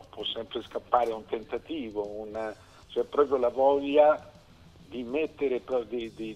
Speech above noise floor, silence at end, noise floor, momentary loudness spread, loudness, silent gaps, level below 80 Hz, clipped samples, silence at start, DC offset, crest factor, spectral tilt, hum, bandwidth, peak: 25 dB; 0 s; -54 dBFS; 13 LU; -29 LUFS; none; -60 dBFS; under 0.1%; 0 s; under 0.1%; 20 dB; -5.5 dB/octave; none; 9.2 kHz; -8 dBFS